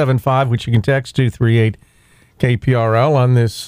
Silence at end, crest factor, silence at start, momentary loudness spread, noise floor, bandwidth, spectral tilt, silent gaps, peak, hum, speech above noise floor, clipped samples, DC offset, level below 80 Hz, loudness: 0 s; 12 dB; 0 s; 6 LU; -51 dBFS; 15 kHz; -7.5 dB/octave; none; -2 dBFS; none; 37 dB; under 0.1%; under 0.1%; -44 dBFS; -15 LUFS